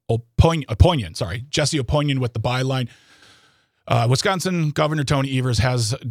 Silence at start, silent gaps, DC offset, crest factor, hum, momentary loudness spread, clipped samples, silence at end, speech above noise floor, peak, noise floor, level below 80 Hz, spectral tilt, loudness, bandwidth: 0.1 s; none; under 0.1%; 20 dB; none; 7 LU; under 0.1%; 0 s; 39 dB; 0 dBFS; -59 dBFS; -34 dBFS; -5.5 dB/octave; -20 LUFS; 15 kHz